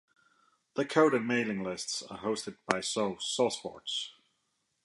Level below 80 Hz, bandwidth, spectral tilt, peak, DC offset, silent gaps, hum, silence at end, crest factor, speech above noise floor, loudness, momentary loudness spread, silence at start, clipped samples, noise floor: -74 dBFS; 11.5 kHz; -3.5 dB/octave; -6 dBFS; under 0.1%; none; none; 0.75 s; 28 dB; 47 dB; -32 LUFS; 10 LU; 0.75 s; under 0.1%; -79 dBFS